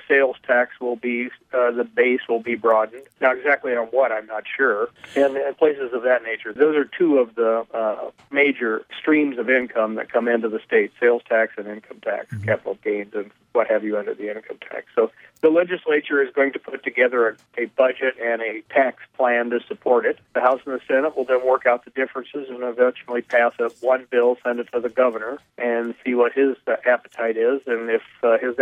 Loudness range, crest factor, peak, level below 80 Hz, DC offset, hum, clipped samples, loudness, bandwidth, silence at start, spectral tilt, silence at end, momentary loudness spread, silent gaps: 2 LU; 18 dB; -4 dBFS; -72 dBFS; under 0.1%; none; under 0.1%; -21 LUFS; 6.8 kHz; 0.1 s; -6.5 dB/octave; 0 s; 9 LU; none